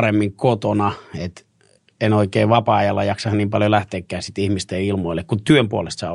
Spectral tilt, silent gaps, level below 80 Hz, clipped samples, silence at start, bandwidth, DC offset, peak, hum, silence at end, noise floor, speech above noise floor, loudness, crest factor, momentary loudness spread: -6.5 dB/octave; none; -50 dBFS; under 0.1%; 0 s; 11 kHz; under 0.1%; -2 dBFS; none; 0 s; -58 dBFS; 39 dB; -19 LUFS; 18 dB; 11 LU